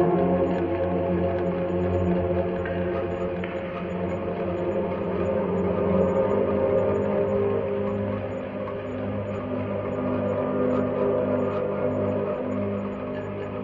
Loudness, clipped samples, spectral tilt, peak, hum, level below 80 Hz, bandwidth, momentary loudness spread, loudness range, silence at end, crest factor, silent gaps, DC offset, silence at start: -26 LUFS; under 0.1%; -10 dB/octave; -10 dBFS; none; -52 dBFS; 7.4 kHz; 8 LU; 4 LU; 0 s; 16 dB; none; under 0.1%; 0 s